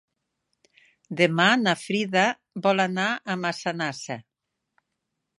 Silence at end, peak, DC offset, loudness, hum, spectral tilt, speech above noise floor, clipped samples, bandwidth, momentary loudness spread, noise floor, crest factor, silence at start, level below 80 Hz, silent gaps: 1.2 s; -4 dBFS; under 0.1%; -23 LUFS; none; -4.5 dB/octave; 57 dB; under 0.1%; 11.5 kHz; 14 LU; -81 dBFS; 22 dB; 1.1 s; -76 dBFS; none